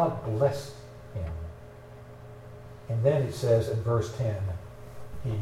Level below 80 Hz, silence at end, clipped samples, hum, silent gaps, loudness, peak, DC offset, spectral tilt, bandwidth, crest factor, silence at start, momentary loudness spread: -48 dBFS; 0 s; under 0.1%; none; none; -29 LUFS; -10 dBFS; under 0.1%; -7.5 dB/octave; 14 kHz; 20 dB; 0 s; 21 LU